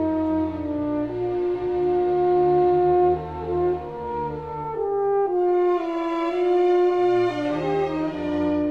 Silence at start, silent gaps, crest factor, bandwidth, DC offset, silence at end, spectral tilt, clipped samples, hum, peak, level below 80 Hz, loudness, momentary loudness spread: 0 s; none; 12 dB; 5.8 kHz; 0.2%; 0 s; -8.5 dB/octave; under 0.1%; none; -10 dBFS; -48 dBFS; -23 LUFS; 9 LU